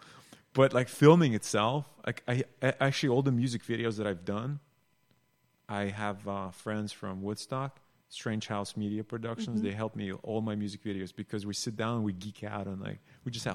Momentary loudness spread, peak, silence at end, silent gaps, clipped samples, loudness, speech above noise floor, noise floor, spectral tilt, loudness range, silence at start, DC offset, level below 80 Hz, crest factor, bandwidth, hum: 13 LU; -8 dBFS; 0 s; none; under 0.1%; -32 LUFS; 41 dB; -72 dBFS; -6 dB/octave; 10 LU; 0.05 s; under 0.1%; -68 dBFS; 24 dB; 15.5 kHz; none